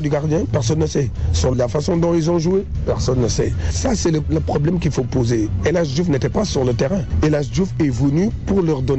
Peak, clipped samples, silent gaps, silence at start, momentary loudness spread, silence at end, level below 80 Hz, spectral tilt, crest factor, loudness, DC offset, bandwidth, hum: -8 dBFS; under 0.1%; none; 0 s; 3 LU; 0 s; -28 dBFS; -6.5 dB/octave; 10 dB; -19 LUFS; 1%; 8.2 kHz; none